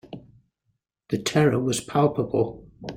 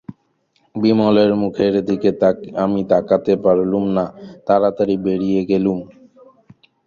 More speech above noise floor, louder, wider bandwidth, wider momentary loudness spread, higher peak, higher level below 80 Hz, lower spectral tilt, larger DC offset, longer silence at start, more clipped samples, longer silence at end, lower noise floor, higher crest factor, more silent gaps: first, 53 dB vs 47 dB; second, -24 LUFS vs -17 LUFS; first, 16.5 kHz vs 7 kHz; first, 19 LU vs 7 LU; second, -6 dBFS vs -2 dBFS; about the same, -56 dBFS vs -52 dBFS; second, -5.5 dB/octave vs -8.5 dB/octave; neither; about the same, 0.1 s vs 0.1 s; neither; second, 0 s vs 1 s; first, -75 dBFS vs -63 dBFS; about the same, 18 dB vs 16 dB; neither